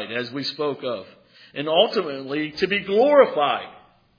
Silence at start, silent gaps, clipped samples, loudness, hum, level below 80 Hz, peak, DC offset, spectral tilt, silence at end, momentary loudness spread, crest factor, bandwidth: 0 s; none; under 0.1%; -21 LUFS; none; -66 dBFS; -2 dBFS; under 0.1%; -5.5 dB/octave; 0.45 s; 14 LU; 20 dB; 5.2 kHz